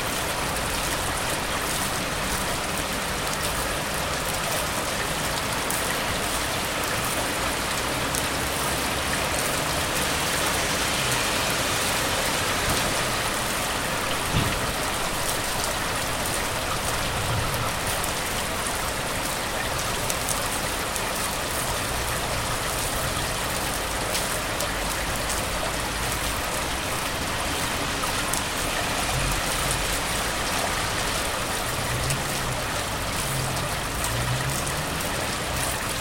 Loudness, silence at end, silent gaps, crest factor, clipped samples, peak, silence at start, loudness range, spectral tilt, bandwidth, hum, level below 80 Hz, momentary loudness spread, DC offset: -25 LUFS; 0 s; none; 22 dB; under 0.1%; -4 dBFS; 0 s; 3 LU; -2.5 dB/octave; 17 kHz; none; -38 dBFS; 3 LU; under 0.1%